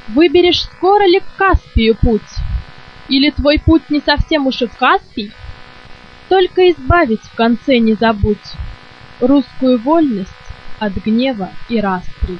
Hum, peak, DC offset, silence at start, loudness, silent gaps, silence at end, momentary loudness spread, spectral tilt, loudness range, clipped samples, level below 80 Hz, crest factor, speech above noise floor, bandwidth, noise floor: none; 0 dBFS; under 0.1%; 0.05 s; -14 LUFS; none; 0 s; 13 LU; -7 dB/octave; 3 LU; under 0.1%; -26 dBFS; 14 dB; 23 dB; 6.6 kHz; -36 dBFS